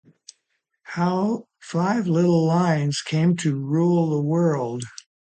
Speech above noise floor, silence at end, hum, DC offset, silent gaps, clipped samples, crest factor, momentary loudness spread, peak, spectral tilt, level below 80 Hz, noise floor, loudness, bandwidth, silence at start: 54 dB; 0.35 s; none; under 0.1%; none; under 0.1%; 14 dB; 10 LU; -8 dBFS; -7 dB/octave; -66 dBFS; -75 dBFS; -22 LUFS; 9 kHz; 0.85 s